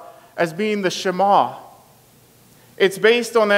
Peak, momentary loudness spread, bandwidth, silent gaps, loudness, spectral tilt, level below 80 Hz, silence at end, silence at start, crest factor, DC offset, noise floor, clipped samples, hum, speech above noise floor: -2 dBFS; 10 LU; 16 kHz; none; -18 LUFS; -4 dB/octave; -70 dBFS; 0 s; 0 s; 18 dB; under 0.1%; -51 dBFS; under 0.1%; none; 34 dB